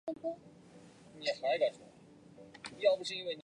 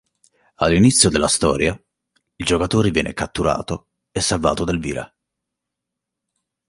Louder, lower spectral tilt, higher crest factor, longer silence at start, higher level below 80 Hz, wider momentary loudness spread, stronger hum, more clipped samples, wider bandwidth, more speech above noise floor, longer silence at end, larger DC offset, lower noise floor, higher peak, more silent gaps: second, -35 LUFS vs -18 LUFS; about the same, -3.5 dB/octave vs -4 dB/octave; about the same, 20 dB vs 20 dB; second, 0.05 s vs 0.6 s; second, -78 dBFS vs -38 dBFS; first, 24 LU vs 16 LU; neither; neither; about the same, 10.5 kHz vs 11.5 kHz; second, 25 dB vs 64 dB; second, 0.05 s vs 1.6 s; neither; second, -58 dBFS vs -82 dBFS; second, -16 dBFS vs 0 dBFS; neither